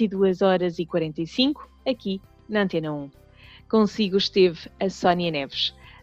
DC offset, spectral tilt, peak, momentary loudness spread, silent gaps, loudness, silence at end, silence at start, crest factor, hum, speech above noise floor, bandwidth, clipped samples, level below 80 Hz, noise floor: under 0.1%; -6 dB/octave; -8 dBFS; 9 LU; none; -24 LUFS; 0.3 s; 0 s; 16 dB; none; 26 dB; 7.8 kHz; under 0.1%; -56 dBFS; -50 dBFS